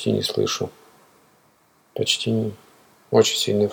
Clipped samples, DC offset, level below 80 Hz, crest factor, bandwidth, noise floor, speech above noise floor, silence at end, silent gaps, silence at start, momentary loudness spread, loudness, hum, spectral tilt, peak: under 0.1%; under 0.1%; -66 dBFS; 22 dB; 20 kHz; -60 dBFS; 38 dB; 0 s; none; 0 s; 12 LU; -22 LUFS; none; -4 dB/octave; -2 dBFS